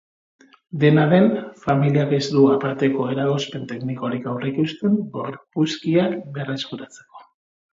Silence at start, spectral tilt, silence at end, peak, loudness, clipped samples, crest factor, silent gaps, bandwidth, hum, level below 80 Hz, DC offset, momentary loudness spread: 0.75 s; -7 dB/octave; 0.5 s; -2 dBFS; -21 LUFS; under 0.1%; 18 dB; none; 7.8 kHz; none; -62 dBFS; under 0.1%; 13 LU